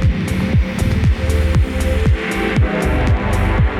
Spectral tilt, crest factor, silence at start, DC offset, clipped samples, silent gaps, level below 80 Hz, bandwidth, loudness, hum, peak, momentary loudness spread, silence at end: -7 dB/octave; 10 dB; 0 s; under 0.1%; under 0.1%; none; -18 dBFS; 13.5 kHz; -17 LUFS; none; -4 dBFS; 2 LU; 0 s